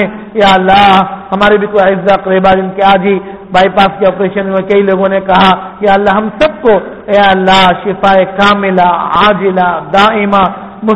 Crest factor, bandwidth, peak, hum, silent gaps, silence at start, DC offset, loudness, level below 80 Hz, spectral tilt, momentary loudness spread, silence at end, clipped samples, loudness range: 8 dB; 8.8 kHz; 0 dBFS; none; none; 0 s; 0.5%; -8 LUFS; -36 dBFS; -6 dB/octave; 6 LU; 0 s; 0.5%; 1 LU